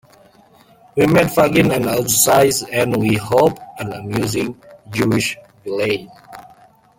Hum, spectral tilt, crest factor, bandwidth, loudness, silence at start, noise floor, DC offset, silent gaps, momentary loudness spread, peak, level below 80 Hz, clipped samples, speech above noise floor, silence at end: none; -4.5 dB/octave; 18 dB; 17 kHz; -16 LUFS; 0.95 s; -49 dBFS; under 0.1%; none; 14 LU; 0 dBFS; -48 dBFS; under 0.1%; 33 dB; 0.55 s